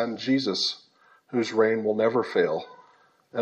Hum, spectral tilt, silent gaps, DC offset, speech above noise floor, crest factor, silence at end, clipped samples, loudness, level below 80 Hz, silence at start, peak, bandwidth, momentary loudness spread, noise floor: none; -4.5 dB/octave; none; under 0.1%; 35 dB; 18 dB; 0 s; under 0.1%; -25 LUFS; -80 dBFS; 0 s; -10 dBFS; 8.6 kHz; 11 LU; -60 dBFS